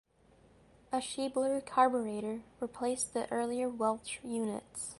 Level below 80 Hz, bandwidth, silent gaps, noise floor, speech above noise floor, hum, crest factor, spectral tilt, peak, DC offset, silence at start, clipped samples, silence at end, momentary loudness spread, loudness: -70 dBFS; 11.5 kHz; none; -64 dBFS; 30 dB; none; 22 dB; -3.5 dB/octave; -14 dBFS; under 0.1%; 0.9 s; under 0.1%; 0.05 s; 10 LU; -34 LUFS